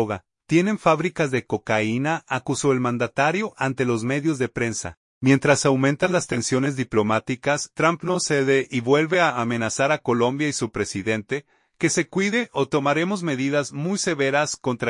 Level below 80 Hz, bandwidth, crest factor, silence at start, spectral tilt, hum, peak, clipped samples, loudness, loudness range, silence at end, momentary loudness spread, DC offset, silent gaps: -58 dBFS; 11 kHz; 18 dB; 0 s; -5 dB/octave; none; -4 dBFS; under 0.1%; -22 LUFS; 2 LU; 0 s; 6 LU; under 0.1%; 4.97-5.21 s